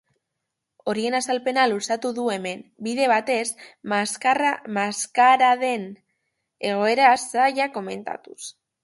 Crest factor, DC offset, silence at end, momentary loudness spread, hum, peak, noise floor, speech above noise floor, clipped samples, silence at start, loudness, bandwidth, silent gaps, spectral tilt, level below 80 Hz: 20 dB; under 0.1%; 0.3 s; 15 LU; none; -4 dBFS; -81 dBFS; 59 dB; under 0.1%; 0.85 s; -22 LUFS; 12 kHz; none; -3 dB/octave; -74 dBFS